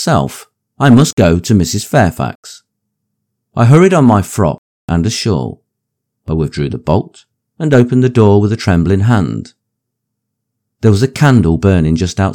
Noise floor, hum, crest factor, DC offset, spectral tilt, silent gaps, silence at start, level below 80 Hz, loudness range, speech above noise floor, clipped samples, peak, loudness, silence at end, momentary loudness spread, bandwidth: -74 dBFS; none; 12 dB; under 0.1%; -6.5 dB/octave; 1.13-1.17 s, 2.35-2.43 s, 4.58-4.88 s; 0 s; -38 dBFS; 3 LU; 64 dB; 0.9%; 0 dBFS; -12 LUFS; 0 s; 13 LU; 17 kHz